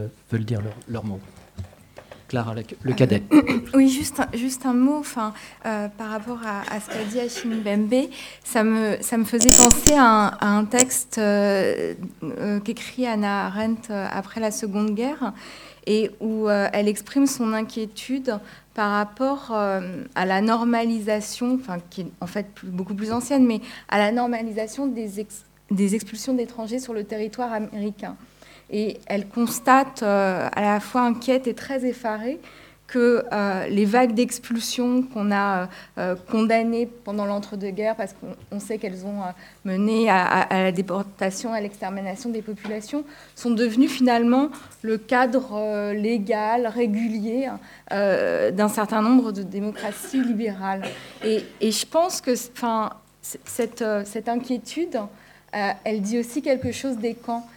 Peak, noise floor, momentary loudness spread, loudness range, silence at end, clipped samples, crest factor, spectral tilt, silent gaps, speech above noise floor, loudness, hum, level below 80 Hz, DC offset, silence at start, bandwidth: 0 dBFS; -46 dBFS; 13 LU; 9 LU; 0.1 s; under 0.1%; 22 dB; -4 dB/octave; none; 23 dB; -23 LUFS; 50 Hz at -55 dBFS; -46 dBFS; under 0.1%; 0 s; over 20 kHz